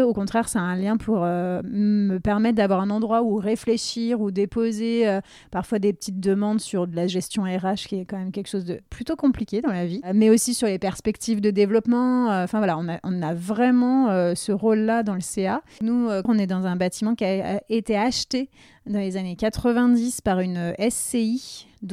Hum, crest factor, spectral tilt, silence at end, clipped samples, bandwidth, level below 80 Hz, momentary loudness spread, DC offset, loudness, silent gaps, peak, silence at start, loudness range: none; 16 dB; -5.5 dB/octave; 0 s; under 0.1%; 15 kHz; -50 dBFS; 9 LU; under 0.1%; -23 LUFS; none; -6 dBFS; 0 s; 4 LU